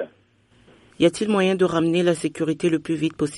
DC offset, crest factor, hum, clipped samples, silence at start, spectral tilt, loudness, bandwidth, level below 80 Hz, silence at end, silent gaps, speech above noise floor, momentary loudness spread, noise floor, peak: under 0.1%; 16 dB; none; under 0.1%; 0 s; -6 dB/octave; -21 LUFS; 11.5 kHz; -58 dBFS; 0 s; none; 38 dB; 6 LU; -58 dBFS; -6 dBFS